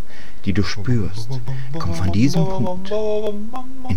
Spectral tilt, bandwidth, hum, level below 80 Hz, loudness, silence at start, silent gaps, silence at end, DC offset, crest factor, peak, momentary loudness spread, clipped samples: -7 dB/octave; 17.5 kHz; none; -38 dBFS; -23 LUFS; 0.05 s; none; 0 s; 20%; 18 dB; -4 dBFS; 12 LU; under 0.1%